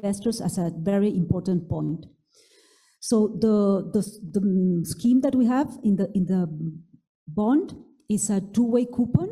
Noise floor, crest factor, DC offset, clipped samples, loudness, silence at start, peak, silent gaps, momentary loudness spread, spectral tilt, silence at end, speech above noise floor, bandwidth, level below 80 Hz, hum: -59 dBFS; 18 dB; under 0.1%; under 0.1%; -24 LUFS; 0.05 s; -6 dBFS; 7.09-7.26 s; 8 LU; -7 dB/octave; 0 s; 36 dB; 13.5 kHz; -56 dBFS; none